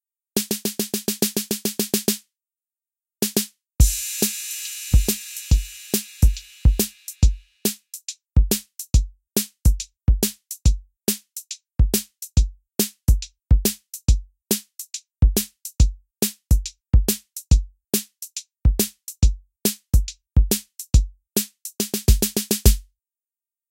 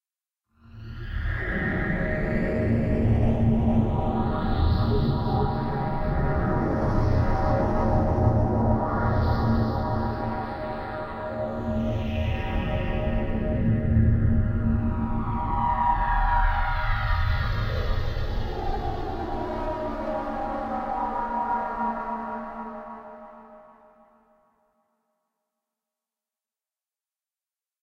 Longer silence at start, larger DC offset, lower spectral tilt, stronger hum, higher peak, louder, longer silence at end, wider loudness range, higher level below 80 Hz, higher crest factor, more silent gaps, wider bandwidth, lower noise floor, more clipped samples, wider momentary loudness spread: second, 0.35 s vs 0.75 s; neither; second, -4.5 dB/octave vs -9 dB/octave; neither; first, 0 dBFS vs -8 dBFS; first, -23 LUFS vs -26 LUFS; second, 0.9 s vs 4.2 s; second, 1 LU vs 6 LU; first, -24 dBFS vs -30 dBFS; first, 22 dB vs 16 dB; neither; first, 17 kHz vs 6.4 kHz; about the same, under -90 dBFS vs under -90 dBFS; neither; about the same, 7 LU vs 9 LU